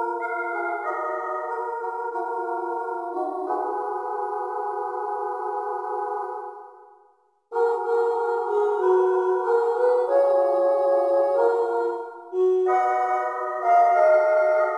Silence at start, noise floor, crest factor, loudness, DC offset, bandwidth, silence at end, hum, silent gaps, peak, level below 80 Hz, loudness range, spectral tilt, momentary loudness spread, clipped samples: 0 s; -61 dBFS; 14 dB; -23 LUFS; under 0.1%; 11 kHz; 0 s; none; none; -8 dBFS; -84 dBFS; 8 LU; -4 dB/octave; 10 LU; under 0.1%